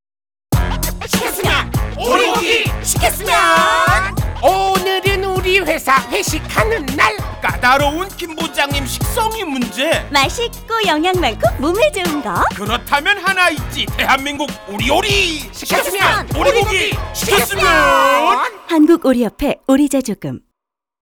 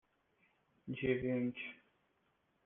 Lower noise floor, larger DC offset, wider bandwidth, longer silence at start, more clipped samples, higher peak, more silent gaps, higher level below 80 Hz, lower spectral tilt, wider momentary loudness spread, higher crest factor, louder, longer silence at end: about the same, -79 dBFS vs -79 dBFS; neither; first, over 20 kHz vs 3.8 kHz; second, 0.5 s vs 0.85 s; neither; first, -2 dBFS vs -22 dBFS; neither; first, -28 dBFS vs -70 dBFS; second, -3.5 dB/octave vs -6 dB/octave; second, 9 LU vs 13 LU; second, 14 dB vs 20 dB; first, -15 LUFS vs -39 LUFS; about the same, 0.8 s vs 0.9 s